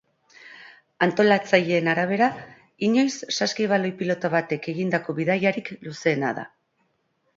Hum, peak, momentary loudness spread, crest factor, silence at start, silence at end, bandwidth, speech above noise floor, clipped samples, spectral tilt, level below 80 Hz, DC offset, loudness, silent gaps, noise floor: none; -4 dBFS; 13 LU; 22 dB; 0.45 s; 0.9 s; 7.8 kHz; 48 dB; under 0.1%; -5 dB/octave; -70 dBFS; under 0.1%; -23 LUFS; none; -70 dBFS